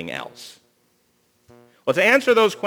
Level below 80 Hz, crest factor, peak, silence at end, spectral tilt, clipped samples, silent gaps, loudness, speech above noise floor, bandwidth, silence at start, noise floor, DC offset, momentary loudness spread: -70 dBFS; 20 dB; -2 dBFS; 0 s; -3.5 dB/octave; under 0.1%; none; -18 LUFS; 45 dB; over 20 kHz; 0 s; -64 dBFS; under 0.1%; 25 LU